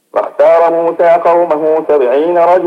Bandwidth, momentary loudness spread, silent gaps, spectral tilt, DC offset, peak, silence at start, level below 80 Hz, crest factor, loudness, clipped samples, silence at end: 6.2 kHz; 3 LU; none; -7 dB/octave; under 0.1%; 0 dBFS; 0.15 s; -60 dBFS; 10 dB; -10 LUFS; under 0.1%; 0 s